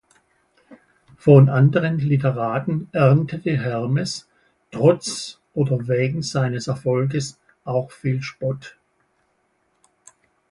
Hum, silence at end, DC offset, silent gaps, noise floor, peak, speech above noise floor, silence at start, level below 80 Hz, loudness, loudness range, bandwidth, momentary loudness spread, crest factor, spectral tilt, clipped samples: none; 1.8 s; under 0.1%; none; -67 dBFS; 0 dBFS; 48 dB; 0.7 s; -58 dBFS; -20 LUFS; 8 LU; 11.5 kHz; 13 LU; 20 dB; -7 dB/octave; under 0.1%